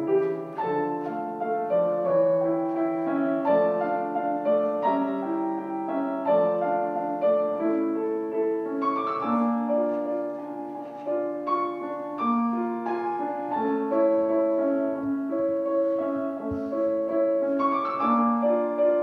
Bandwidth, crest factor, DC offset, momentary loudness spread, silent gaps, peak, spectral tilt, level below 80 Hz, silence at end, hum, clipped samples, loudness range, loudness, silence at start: 4.9 kHz; 14 dB; under 0.1%; 7 LU; none; -10 dBFS; -9 dB/octave; -66 dBFS; 0 s; none; under 0.1%; 3 LU; -26 LUFS; 0 s